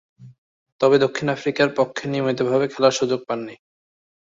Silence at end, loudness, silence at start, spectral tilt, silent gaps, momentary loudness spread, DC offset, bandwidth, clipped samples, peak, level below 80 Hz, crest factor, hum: 0.7 s; -21 LUFS; 0.2 s; -5 dB/octave; 0.38-0.66 s, 0.72-0.79 s; 8 LU; under 0.1%; 7.8 kHz; under 0.1%; -4 dBFS; -64 dBFS; 18 dB; none